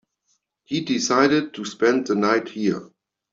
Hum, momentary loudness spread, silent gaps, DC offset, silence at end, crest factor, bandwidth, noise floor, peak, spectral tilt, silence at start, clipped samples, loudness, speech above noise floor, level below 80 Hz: none; 10 LU; none; under 0.1%; 0.5 s; 20 dB; 7.8 kHz; -71 dBFS; -4 dBFS; -4 dB/octave; 0.7 s; under 0.1%; -22 LUFS; 50 dB; -66 dBFS